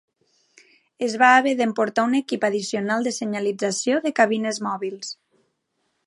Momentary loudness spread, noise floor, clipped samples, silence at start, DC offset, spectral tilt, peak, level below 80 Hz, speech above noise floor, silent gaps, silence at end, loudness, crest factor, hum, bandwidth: 13 LU; -73 dBFS; under 0.1%; 1 s; under 0.1%; -3.5 dB/octave; -2 dBFS; -76 dBFS; 52 dB; none; 0.95 s; -21 LUFS; 22 dB; none; 11.5 kHz